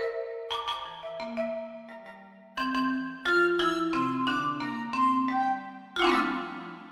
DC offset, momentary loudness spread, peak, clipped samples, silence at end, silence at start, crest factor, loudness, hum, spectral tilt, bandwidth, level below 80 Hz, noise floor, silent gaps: under 0.1%; 15 LU; -10 dBFS; under 0.1%; 0 s; 0 s; 18 dB; -29 LUFS; none; -4.5 dB/octave; 13.5 kHz; -62 dBFS; -49 dBFS; none